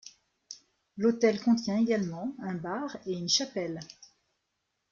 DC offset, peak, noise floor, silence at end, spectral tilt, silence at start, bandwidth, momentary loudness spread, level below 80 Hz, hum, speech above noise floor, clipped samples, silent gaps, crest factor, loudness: under 0.1%; -12 dBFS; -81 dBFS; 0.85 s; -4.5 dB/octave; 0.05 s; 7.4 kHz; 22 LU; -72 dBFS; none; 52 dB; under 0.1%; none; 20 dB; -29 LUFS